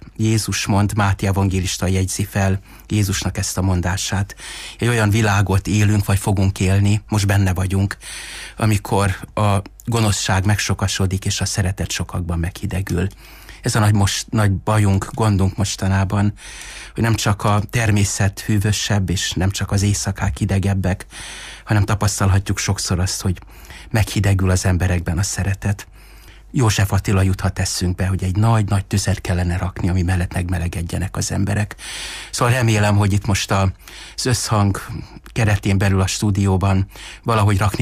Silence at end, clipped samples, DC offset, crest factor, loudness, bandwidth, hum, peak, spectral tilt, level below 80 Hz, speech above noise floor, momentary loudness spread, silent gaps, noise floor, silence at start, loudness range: 0 s; under 0.1%; under 0.1%; 12 dB; -19 LUFS; 15.5 kHz; none; -6 dBFS; -5 dB/octave; -36 dBFS; 23 dB; 9 LU; none; -41 dBFS; 0 s; 2 LU